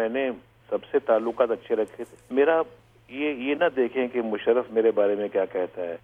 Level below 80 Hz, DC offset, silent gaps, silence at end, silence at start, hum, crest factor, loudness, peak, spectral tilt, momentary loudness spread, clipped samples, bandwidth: -68 dBFS; under 0.1%; none; 0.05 s; 0 s; none; 18 dB; -25 LUFS; -6 dBFS; -6.5 dB/octave; 11 LU; under 0.1%; 8.6 kHz